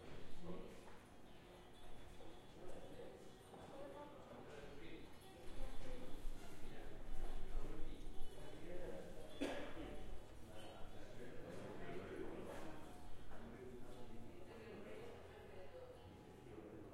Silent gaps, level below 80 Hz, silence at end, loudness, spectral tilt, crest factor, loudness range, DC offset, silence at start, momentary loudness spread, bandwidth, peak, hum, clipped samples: none; -54 dBFS; 0 s; -56 LUFS; -5.5 dB/octave; 16 dB; 6 LU; under 0.1%; 0 s; 9 LU; 12 kHz; -30 dBFS; none; under 0.1%